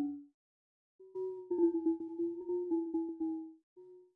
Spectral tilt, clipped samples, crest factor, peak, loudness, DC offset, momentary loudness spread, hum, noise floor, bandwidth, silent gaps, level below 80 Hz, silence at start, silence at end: -10.5 dB/octave; under 0.1%; 16 dB; -20 dBFS; -37 LUFS; under 0.1%; 13 LU; none; under -90 dBFS; 1.7 kHz; 0.34-0.99 s, 3.63-3.76 s; -80 dBFS; 0 s; 0.15 s